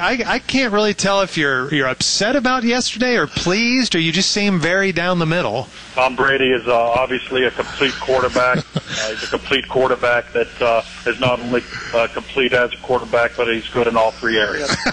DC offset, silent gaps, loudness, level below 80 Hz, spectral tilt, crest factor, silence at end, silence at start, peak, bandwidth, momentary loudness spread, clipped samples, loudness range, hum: under 0.1%; none; -17 LUFS; -44 dBFS; -3.5 dB/octave; 14 dB; 0 s; 0 s; -4 dBFS; 10.5 kHz; 6 LU; under 0.1%; 2 LU; none